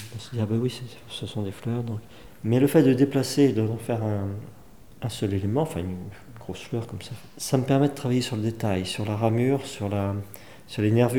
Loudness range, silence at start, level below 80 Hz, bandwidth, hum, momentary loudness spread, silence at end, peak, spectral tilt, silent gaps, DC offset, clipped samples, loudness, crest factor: 6 LU; 0 s; -58 dBFS; 19.5 kHz; none; 16 LU; 0 s; -6 dBFS; -6.5 dB/octave; none; 0.4%; under 0.1%; -26 LUFS; 20 dB